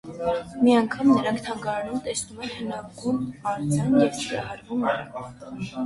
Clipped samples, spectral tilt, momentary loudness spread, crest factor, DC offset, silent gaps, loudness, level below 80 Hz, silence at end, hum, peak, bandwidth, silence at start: under 0.1%; -5.5 dB/octave; 13 LU; 18 dB; under 0.1%; none; -25 LUFS; -56 dBFS; 0 s; none; -8 dBFS; 11.5 kHz; 0.05 s